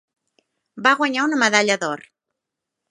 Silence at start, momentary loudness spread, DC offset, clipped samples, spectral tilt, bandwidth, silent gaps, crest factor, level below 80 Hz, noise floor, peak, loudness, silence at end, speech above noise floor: 0.75 s; 9 LU; under 0.1%; under 0.1%; -2.5 dB/octave; 11.5 kHz; none; 22 dB; -76 dBFS; -83 dBFS; 0 dBFS; -18 LUFS; 0.9 s; 64 dB